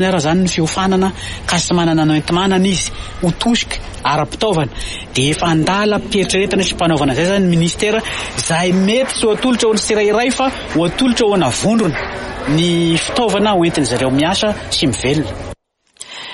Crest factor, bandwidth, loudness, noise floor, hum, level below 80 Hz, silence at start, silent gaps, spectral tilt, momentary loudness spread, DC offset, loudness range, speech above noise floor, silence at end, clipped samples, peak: 12 dB; 11.5 kHz; -15 LUFS; -39 dBFS; none; -34 dBFS; 0 s; none; -4.5 dB/octave; 7 LU; under 0.1%; 2 LU; 24 dB; 0 s; under 0.1%; -4 dBFS